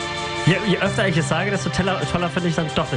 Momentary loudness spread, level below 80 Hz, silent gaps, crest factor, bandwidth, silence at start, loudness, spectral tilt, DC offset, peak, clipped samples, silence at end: 3 LU; -44 dBFS; none; 16 dB; 10.5 kHz; 0 s; -21 LUFS; -5 dB/octave; under 0.1%; -4 dBFS; under 0.1%; 0 s